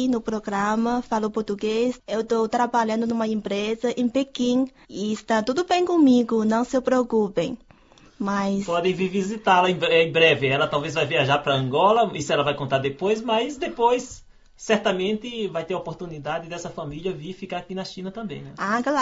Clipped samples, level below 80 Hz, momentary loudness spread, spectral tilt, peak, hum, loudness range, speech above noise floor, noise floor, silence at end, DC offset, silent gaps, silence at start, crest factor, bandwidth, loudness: under 0.1%; -56 dBFS; 13 LU; -5 dB/octave; -4 dBFS; none; 7 LU; 30 dB; -52 dBFS; 0 s; under 0.1%; none; 0 s; 20 dB; 7.8 kHz; -23 LUFS